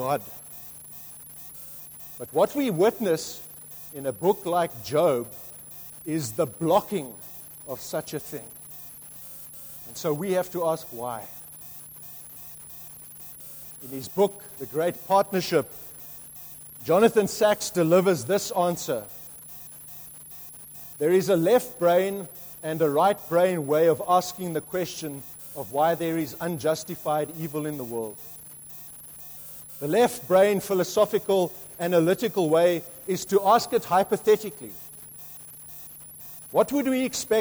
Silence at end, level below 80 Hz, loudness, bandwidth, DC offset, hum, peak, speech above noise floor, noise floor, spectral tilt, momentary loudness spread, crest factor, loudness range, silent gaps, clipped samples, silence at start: 0 s; -64 dBFS; -25 LUFS; over 20 kHz; under 0.1%; none; -6 dBFS; 19 dB; -43 dBFS; -5 dB/octave; 18 LU; 20 dB; 8 LU; none; under 0.1%; 0 s